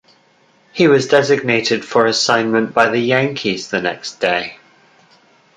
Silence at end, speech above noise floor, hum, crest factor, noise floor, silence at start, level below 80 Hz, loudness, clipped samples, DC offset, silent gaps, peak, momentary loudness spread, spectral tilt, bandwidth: 1 s; 39 dB; none; 16 dB; -54 dBFS; 0.75 s; -60 dBFS; -15 LUFS; under 0.1%; under 0.1%; none; 0 dBFS; 8 LU; -4 dB/octave; 9.6 kHz